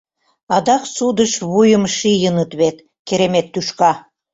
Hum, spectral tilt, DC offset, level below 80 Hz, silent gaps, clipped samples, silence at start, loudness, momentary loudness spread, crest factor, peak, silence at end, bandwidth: none; -4.5 dB/octave; under 0.1%; -54 dBFS; 2.99-3.05 s; under 0.1%; 0.5 s; -16 LUFS; 7 LU; 14 dB; -2 dBFS; 0.35 s; 8 kHz